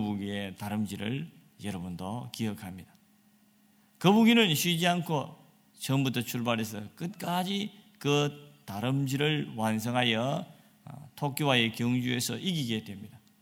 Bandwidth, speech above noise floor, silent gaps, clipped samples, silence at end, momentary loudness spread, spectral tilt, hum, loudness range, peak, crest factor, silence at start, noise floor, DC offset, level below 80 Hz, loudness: 17.5 kHz; 34 dB; none; under 0.1%; 0.25 s; 17 LU; -5 dB/octave; none; 8 LU; -8 dBFS; 22 dB; 0 s; -64 dBFS; under 0.1%; -70 dBFS; -29 LUFS